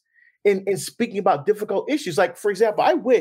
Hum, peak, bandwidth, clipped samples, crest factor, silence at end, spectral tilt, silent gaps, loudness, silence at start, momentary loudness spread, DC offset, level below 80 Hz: none; -6 dBFS; 16 kHz; under 0.1%; 16 dB; 0 s; -4.5 dB/octave; none; -21 LUFS; 0.45 s; 5 LU; under 0.1%; -78 dBFS